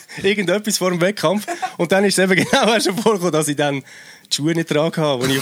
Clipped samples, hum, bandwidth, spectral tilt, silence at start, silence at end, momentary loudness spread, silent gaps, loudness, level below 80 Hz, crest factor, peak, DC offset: under 0.1%; none; over 20 kHz; -4 dB/octave; 0.1 s; 0 s; 7 LU; none; -18 LUFS; -60 dBFS; 16 dB; -2 dBFS; under 0.1%